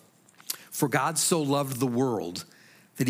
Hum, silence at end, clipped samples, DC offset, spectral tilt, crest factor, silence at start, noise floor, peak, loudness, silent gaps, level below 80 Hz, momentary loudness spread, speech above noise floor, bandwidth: none; 0 s; under 0.1%; under 0.1%; -4 dB/octave; 18 dB; 0.5 s; -52 dBFS; -10 dBFS; -27 LUFS; none; -78 dBFS; 13 LU; 26 dB; 16.5 kHz